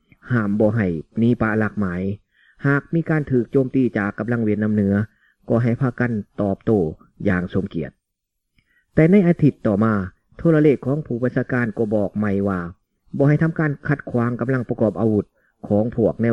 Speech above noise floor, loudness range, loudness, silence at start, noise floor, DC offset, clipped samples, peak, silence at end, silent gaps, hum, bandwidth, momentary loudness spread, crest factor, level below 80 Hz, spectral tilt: 59 dB; 3 LU; -20 LUFS; 0.25 s; -78 dBFS; 0.1%; under 0.1%; -2 dBFS; 0 s; none; none; 6 kHz; 8 LU; 18 dB; -50 dBFS; -10.5 dB/octave